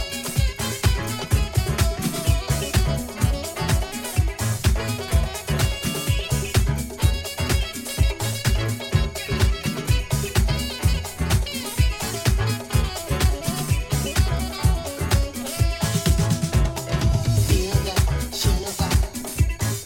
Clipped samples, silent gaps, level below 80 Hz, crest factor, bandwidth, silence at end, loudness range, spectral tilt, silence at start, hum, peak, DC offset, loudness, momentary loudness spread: under 0.1%; none; -26 dBFS; 16 dB; 17 kHz; 0 s; 2 LU; -4.5 dB/octave; 0 s; none; -4 dBFS; under 0.1%; -23 LUFS; 4 LU